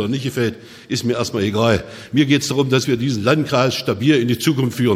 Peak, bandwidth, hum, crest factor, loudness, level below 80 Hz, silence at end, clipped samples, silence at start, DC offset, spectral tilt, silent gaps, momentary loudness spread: 0 dBFS; 16 kHz; none; 16 dB; -18 LUFS; -52 dBFS; 0 s; under 0.1%; 0 s; under 0.1%; -5.5 dB/octave; none; 6 LU